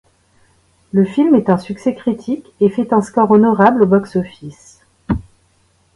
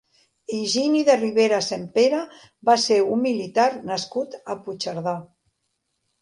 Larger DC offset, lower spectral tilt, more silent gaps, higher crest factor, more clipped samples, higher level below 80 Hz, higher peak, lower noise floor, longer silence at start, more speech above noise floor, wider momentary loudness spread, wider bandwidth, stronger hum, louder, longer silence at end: neither; first, -8.5 dB/octave vs -4 dB/octave; neither; about the same, 16 dB vs 18 dB; neither; first, -42 dBFS vs -70 dBFS; first, 0 dBFS vs -4 dBFS; second, -57 dBFS vs -75 dBFS; first, 0.95 s vs 0.5 s; second, 43 dB vs 54 dB; about the same, 12 LU vs 13 LU; about the same, 11.5 kHz vs 11.5 kHz; neither; first, -15 LUFS vs -22 LUFS; second, 0.8 s vs 0.95 s